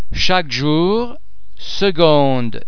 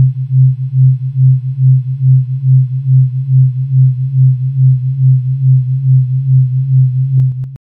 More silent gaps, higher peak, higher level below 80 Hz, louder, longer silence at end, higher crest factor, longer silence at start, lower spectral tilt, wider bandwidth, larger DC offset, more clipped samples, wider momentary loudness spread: neither; about the same, 0 dBFS vs -2 dBFS; first, -36 dBFS vs -46 dBFS; second, -15 LUFS vs -11 LUFS; about the same, 0 s vs 0.1 s; first, 16 dB vs 8 dB; about the same, 0 s vs 0 s; second, -5.5 dB/octave vs -13.5 dB/octave; first, 5.4 kHz vs 0.3 kHz; first, 10% vs under 0.1%; neither; first, 14 LU vs 1 LU